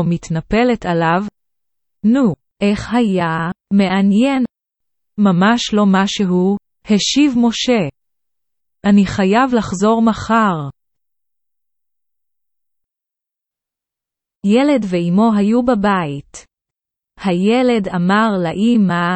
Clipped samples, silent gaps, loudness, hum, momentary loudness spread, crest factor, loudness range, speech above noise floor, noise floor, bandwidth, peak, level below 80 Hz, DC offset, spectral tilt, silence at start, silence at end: under 0.1%; none; -15 LUFS; none; 8 LU; 16 dB; 5 LU; 72 dB; -86 dBFS; 8.6 kHz; 0 dBFS; -46 dBFS; under 0.1%; -6 dB/octave; 0 s; 0 s